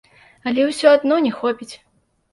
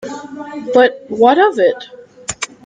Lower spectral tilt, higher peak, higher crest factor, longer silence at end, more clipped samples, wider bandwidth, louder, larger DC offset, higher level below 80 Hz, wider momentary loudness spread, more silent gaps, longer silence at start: about the same, -4 dB/octave vs -3 dB/octave; about the same, -2 dBFS vs 0 dBFS; about the same, 18 dB vs 14 dB; first, 0.6 s vs 0.2 s; neither; first, 11.5 kHz vs 9.6 kHz; second, -17 LUFS vs -13 LUFS; neither; second, -64 dBFS vs -56 dBFS; about the same, 16 LU vs 18 LU; neither; first, 0.45 s vs 0 s